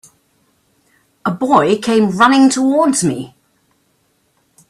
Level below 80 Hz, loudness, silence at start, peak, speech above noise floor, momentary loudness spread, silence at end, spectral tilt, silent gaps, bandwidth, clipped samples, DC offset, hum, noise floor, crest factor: -56 dBFS; -13 LUFS; 1.25 s; 0 dBFS; 48 dB; 13 LU; 1.45 s; -4.5 dB/octave; none; 13 kHz; under 0.1%; under 0.1%; none; -61 dBFS; 16 dB